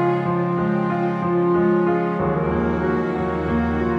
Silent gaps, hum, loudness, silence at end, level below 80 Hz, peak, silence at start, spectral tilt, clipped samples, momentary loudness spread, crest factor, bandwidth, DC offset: none; none; -21 LUFS; 0 s; -38 dBFS; -8 dBFS; 0 s; -9.5 dB/octave; under 0.1%; 4 LU; 12 dB; 6 kHz; under 0.1%